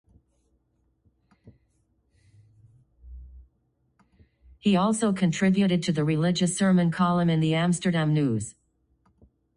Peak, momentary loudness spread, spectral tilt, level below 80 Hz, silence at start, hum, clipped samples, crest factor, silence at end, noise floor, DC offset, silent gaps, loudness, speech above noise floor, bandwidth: -10 dBFS; 3 LU; -6 dB/octave; -56 dBFS; 1.45 s; none; under 0.1%; 16 dB; 1.05 s; -71 dBFS; under 0.1%; none; -24 LUFS; 48 dB; 10.5 kHz